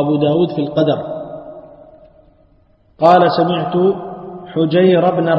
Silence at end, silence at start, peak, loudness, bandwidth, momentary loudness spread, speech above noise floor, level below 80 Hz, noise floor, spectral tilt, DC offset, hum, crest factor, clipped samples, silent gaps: 0 s; 0 s; 0 dBFS; -14 LUFS; 6 kHz; 19 LU; 39 dB; -54 dBFS; -52 dBFS; -9 dB/octave; under 0.1%; none; 16 dB; under 0.1%; none